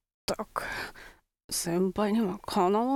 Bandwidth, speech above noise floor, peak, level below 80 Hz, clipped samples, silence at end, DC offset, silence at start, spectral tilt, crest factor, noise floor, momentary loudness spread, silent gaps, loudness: 17.5 kHz; 24 dB; -12 dBFS; -56 dBFS; under 0.1%; 0 s; under 0.1%; 0.3 s; -4.5 dB/octave; 18 dB; -53 dBFS; 10 LU; 1.44-1.49 s; -30 LUFS